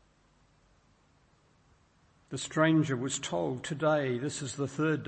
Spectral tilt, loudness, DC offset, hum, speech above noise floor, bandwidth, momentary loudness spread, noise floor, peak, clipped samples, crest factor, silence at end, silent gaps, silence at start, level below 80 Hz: -5 dB/octave; -31 LUFS; under 0.1%; none; 36 dB; 8.8 kHz; 10 LU; -66 dBFS; -12 dBFS; under 0.1%; 20 dB; 0 s; none; 2.3 s; -68 dBFS